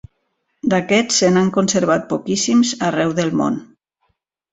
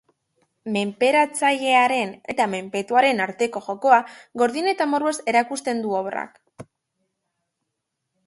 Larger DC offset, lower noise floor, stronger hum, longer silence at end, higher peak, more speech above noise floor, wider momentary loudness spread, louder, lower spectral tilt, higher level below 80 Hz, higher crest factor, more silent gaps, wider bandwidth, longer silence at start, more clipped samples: neither; second, -70 dBFS vs -80 dBFS; neither; second, 0.9 s vs 1.65 s; about the same, -2 dBFS vs -2 dBFS; second, 53 dB vs 59 dB; second, 7 LU vs 10 LU; first, -17 LUFS vs -21 LUFS; about the same, -4 dB/octave vs -3.5 dB/octave; first, -56 dBFS vs -72 dBFS; about the same, 16 dB vs 20 dB; neither; second, 8.4 kHz vs 11.5 kHz; about the same, 0.65 s vs 0.65 s; neither